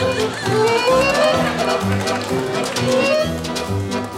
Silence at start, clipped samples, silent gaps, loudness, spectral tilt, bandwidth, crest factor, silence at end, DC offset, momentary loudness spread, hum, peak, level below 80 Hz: 0 s; under 0.1%; none; -18 LUFS; -4.5 dB/octave; 16.5 kHz; 14 dB; 0 s; under 0.1%; 7 LU; none; -4 dBFS; -44 dBFS